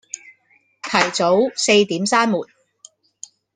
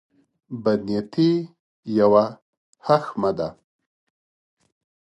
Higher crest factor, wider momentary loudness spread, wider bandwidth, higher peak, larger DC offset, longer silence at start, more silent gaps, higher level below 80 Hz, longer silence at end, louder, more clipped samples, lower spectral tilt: about the same, 20 dB vs 20 dB; first, 24 LU vs 17 LU; about the same, 10 kHz vs 10.5 kHz; first, 0 dBFS vs -4 dBFS; neither; second, 0.15 s vs 0.5 s; second, none vs 1.60-1.83 s, 2.42-2.73 s; about the same, -64 dBFS vs -62 dBFS; second, 1.1 s vs 1.6 s; first, -17 LUFS vs -22 LUFS; neither; second, -3 dB/octave vs -8 dB/octave